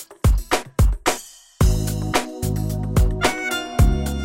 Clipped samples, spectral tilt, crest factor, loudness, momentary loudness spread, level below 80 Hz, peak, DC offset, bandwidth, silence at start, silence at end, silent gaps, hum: under 0.1%; -5 dB/octave; 16 dB; -21 LUFS; 5 LU; -22 dBFS; -4 dBFS; under 0.1%; 16.5 kHz; 0 s; 0 s; none; none